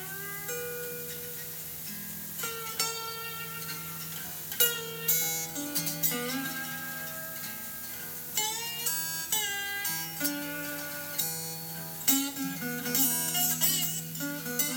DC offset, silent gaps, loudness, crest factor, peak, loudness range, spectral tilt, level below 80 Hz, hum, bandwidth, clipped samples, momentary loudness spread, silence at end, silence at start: under 0.1%; none; -30 LUFS; 24 dB; -8 dBFS; 7 LU; -1.5 dB/octave; -68 dBFS; none; over 20 kHz; under 0.1%; 11 LU; 0 s; 0 s